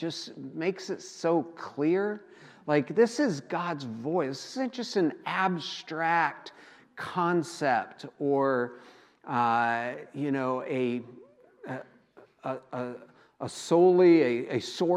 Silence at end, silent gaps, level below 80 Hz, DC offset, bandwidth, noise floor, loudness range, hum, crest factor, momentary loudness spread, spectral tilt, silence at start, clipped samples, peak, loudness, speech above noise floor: 0 s; none; -82 dBFS; under 0.1%; 11.5 kHz; -58 dBFS; 6 LU; none; 18 dB; 16 LU; -5.5 dB/octave; 0 s; under 0.1%; -10 dBFS; -28 LUFS; 30 dB